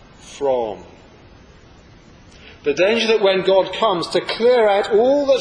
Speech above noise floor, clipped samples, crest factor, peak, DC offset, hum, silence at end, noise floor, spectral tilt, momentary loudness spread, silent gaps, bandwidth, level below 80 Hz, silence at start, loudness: 29 dB; under 0.1%; 16 dB; -2 dBFS; under 0.1%; none; 0 s; -45 dBFS; -4 dB/octave; 10 LU; none; 10.5 kHz; -52 dBFS; 0.25 s; -17 LUFS